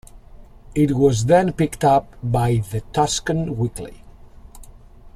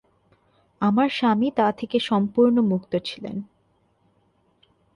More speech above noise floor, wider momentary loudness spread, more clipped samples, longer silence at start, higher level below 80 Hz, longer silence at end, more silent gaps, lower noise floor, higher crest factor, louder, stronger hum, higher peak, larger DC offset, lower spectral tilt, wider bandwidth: second, 24 dB vs 44 dB; second, 10 LU vs 13 LU; neither; second, 0.15 s vs 0.8 s; first, -40 dBFS vs -64 dBFS; second, 0.05 s vs 1.5 s; neither; second, -43 dBFS vs -65 dBFS; about the same, 18 dB vs 16 dB; about the same, -20 LUFS vs -22 LUFS; neither; first, -2 dBFS vs -8 dBFS; neither; about the same, -6 dB/octave vs -7 dB/octave; first, 14 kHz vs 11 kHz